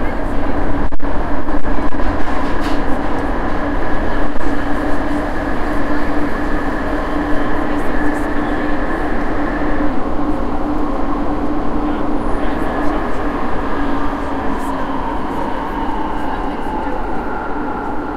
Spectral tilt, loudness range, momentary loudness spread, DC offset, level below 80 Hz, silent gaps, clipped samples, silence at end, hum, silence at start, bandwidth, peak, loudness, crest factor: -7 dB/octave; 2 LU; 3 LU; under 0.1%; -22 dBFS; none; under 0.1%; 0 s; none; 0 s; 5.8 kHz; -2 dBFS; -20 LUFS; 12 dB